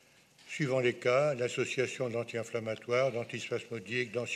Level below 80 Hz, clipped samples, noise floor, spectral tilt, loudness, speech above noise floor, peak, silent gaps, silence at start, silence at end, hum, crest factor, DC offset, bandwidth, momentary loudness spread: -80 dBFS; under 0.1%; -60 dBFS; -5 dB/octave; -33 LUFS; 27 dB; -16 dBFS; none; 0.45 s; 0 s; none; 16 dB; under 0.1%; 13.5 kHz; 9 LU